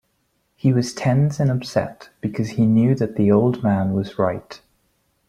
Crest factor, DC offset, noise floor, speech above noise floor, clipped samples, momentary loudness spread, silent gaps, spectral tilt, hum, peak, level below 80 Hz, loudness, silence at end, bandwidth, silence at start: 16 dB; under 0.1%; -68 dBFS; 49 dB; under 0.1%; 9 LU; none; -7.5 dB/octave; none; -4 dBFS; -54 dBFS; -20 LUFS; 0.7 s; 12 kHz; 0.65 s